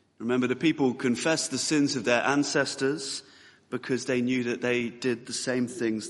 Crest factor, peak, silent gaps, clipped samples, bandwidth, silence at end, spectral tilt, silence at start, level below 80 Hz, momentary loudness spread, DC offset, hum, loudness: 20 dB; -8 dBFS; none; under 0.1%; 11.5 kHz; 0 s; -4 dB/octave; 0.2 s; -70 dBFS; 7 LU; under 0.1%; none; -27 LUFS